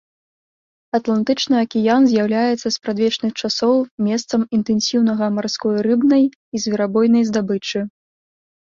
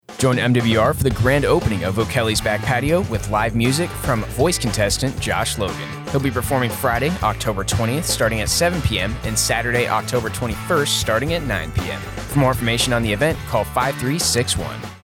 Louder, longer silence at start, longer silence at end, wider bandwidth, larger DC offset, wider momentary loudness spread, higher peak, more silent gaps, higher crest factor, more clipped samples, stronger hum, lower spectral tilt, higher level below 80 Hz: about the same, -18 LUFS vs -19 LUFS; first, 0.95 s vs 0.1 s; first, 0.85 s vs 0.05 s; second, 7.4 kHz vs 18 kHz; neither; about the same, 7 LU vs 6 LU; about the same, -4 dBFS vs -4 dBFS; first, 3.91-3.98 s, 6.35-6.52 s vs none; about the same, 14 dB vs 16 dB; neither; neither; about the same, -5 dB/octave vs -4.5 dB/octave; second, -60 dBFS vs -34 dBFS